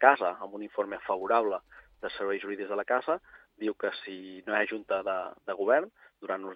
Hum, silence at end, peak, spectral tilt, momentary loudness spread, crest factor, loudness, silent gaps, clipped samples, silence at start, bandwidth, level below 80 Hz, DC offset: none; 0 s; -4 dBFS; -6.5 dB/octave; 13 LU; 28 dB; -31 LUFS; none; under 0.1%; 0 s; 5 kHz; -72 dBFS; under 0.1%